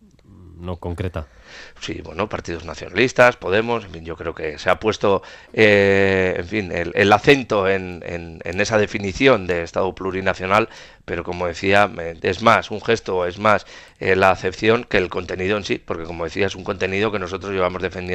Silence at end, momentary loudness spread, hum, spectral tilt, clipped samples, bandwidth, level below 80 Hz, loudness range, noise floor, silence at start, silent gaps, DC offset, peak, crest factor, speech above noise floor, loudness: 0 s; 15 LU; none; -5 dB/octave; under 0.1%; 12 kHz; -48 dBFS; 4 LU; -45 dBFS; 0.4 s; none; under 0.1%; 0 dBFS; 20 dB; 26 dB; -19 LUFS